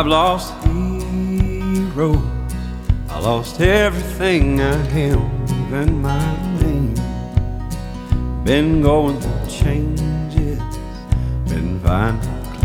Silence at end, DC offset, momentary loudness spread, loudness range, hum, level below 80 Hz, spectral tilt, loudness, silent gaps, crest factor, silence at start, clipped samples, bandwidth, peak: 0 s; under 0.1%; 8 LU; 3 LU; none; -24 dBFS; -6.5 dB/octave; -19 LUFS; none; 16 dB; 0 s; under 0.1%; 17 kHz; 0 dBFS